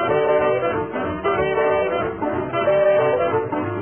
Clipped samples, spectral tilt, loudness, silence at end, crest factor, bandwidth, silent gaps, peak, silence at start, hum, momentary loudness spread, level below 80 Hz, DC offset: under 0.1%; -10.5 dB/octave; -20 LUFS; 0 s; 12 dB; 3.4 kHz; none; -8 dBFS; 0 s; none; 7 LU; -48 dBFS; 0.2%